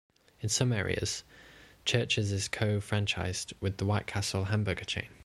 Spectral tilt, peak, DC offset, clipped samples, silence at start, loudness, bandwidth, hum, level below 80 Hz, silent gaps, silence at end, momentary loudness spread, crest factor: -4 dB/octave; -12 dBFS; under 0.1%; under 0.1%; 0.4 s; -31 LUFS; 12.5 kHz; none; -54 dBFS; none; 0.1 s; 7 LU; 20 dB